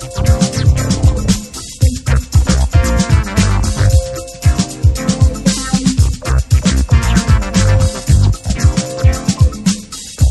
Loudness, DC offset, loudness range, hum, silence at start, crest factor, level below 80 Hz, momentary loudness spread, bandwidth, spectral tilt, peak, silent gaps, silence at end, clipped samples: -14 LUFS; under 0.1%; 1 LU; none; 0 s; 12 dB; -16 dBFS; 4 LU; 13 kHz; -5.5 dB/octave; 0 dBFS; none; 0 s; under 0.1%